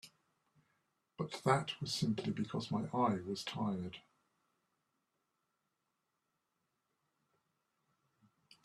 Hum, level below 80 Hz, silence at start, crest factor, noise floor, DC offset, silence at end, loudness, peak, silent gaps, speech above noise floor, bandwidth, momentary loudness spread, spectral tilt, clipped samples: none; -76 dBFS; 0.05 s; 24 dB; -86 dBFS; under 0.1%; 4.65 s; -38 LUFS; -18 dBFS; none; 49 dB; 13 kHz; 10 LU; -5.5 dB/octave; under 0.1%